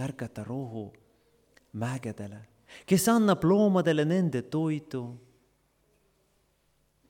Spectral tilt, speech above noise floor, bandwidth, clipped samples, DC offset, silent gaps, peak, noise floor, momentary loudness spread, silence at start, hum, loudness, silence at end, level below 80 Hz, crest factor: -6 dB/octave; 43 dB; 18 kHz; under 0.1%; under 0.1%; none; -12 dBFS; -71 dBFS; 20 LU; 0 s; none; -27 LUFS; 1.9 s; -64 dBFS; 18 dB